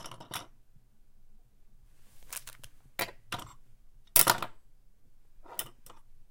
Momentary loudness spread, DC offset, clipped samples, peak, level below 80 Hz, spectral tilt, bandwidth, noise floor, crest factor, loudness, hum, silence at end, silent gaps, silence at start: 21 LU; under 0.1%; under 0.1%; -4 dBFS; -56 dBFS; -0.5 dB/octave; 17 kHz; -56 dBFS; 34 dB; -30 LUFS; none; 0.1 s; none; 0 s